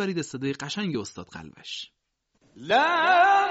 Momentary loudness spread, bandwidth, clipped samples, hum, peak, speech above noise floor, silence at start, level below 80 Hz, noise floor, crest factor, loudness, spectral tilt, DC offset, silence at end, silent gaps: 23 LU; 8 kHz; under 0.1%; none; -8 dBFS; 45 dB; 0 s; -66 dBFS; -69 dBFS; 18 dB; -23 LUFS; -2 dB/octave; under 0.1%; 0 s; none